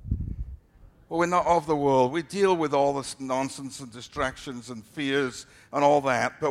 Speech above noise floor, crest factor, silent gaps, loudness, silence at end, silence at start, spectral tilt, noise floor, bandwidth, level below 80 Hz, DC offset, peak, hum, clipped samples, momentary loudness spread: 29 dB; 18 dB; none; -25 LUFS; 0 s; 0 s; -5 dB/octave; -54 dBFS; 14.5 kHz; -44 dBFS; under 0.1%; -8 dBFS; none; under 0.1%; 16 LU